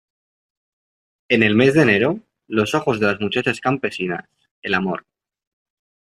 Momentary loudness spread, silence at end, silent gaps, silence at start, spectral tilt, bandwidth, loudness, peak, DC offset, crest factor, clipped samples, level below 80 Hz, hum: 13 LU; 1.15 s; 4.51-4.62 s; 1.3 s; -6 dB/octave; 14 kHz; -19 LUFS; -2 dBFS; under 0.1%; 18 dB; under 0.1%; -58 dBFS; none